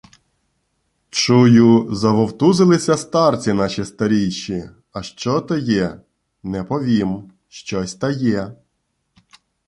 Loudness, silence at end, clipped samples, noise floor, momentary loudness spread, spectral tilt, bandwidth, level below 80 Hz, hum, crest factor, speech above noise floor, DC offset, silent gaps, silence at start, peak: -17 LUFS; 1.15 s; under 0.1%; -71 dBFS; 16 LU; -6 dB/octave; 11.5 kHz; -50 dBFS; none; 16 dB; 54 dB; under 0.1%; none; 1.15 s; -2 dBFS